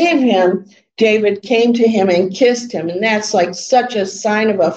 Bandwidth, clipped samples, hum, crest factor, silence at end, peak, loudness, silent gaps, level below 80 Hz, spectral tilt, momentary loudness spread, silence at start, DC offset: 8.6 kHz; under 0.1%; none; 12 dB; 0 s; -2 dBFS; -14 LUFS; none; -66 dBFS; -4.5 dB/octave; 6 LU; 0 s; under 0.1%